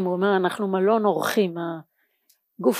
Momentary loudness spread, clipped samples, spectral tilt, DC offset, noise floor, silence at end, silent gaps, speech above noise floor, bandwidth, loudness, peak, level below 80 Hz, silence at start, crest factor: 11 LU; under 0.1%; -5.5 dB/octave; under 0.1%; -66 dBFS; 0 s; none; 44 dB; 15.5 kHz; -23 LUFS; -8 dBFS; -80 dBFS; 0 s; 16 dB